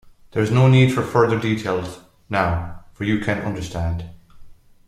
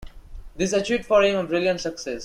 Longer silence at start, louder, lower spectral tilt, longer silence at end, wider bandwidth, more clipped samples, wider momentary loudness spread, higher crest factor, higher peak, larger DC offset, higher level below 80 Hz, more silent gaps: first, 0.35 s vs 0 s; about the same, -20 LUFS vs -22 LUFS; first, -7 dB/octave vs -4 dB/octave; first, 0.35 s vs 0 s; about the same, 12 kHz vs 12 kHz; neither; first, 14 LU vs 9 LU; about the same, 18 dB vs 18 dB; first, -2 dBFS vs -6 dBFS; neither; about the same, -42 dBFS vs -44 dBFS; neither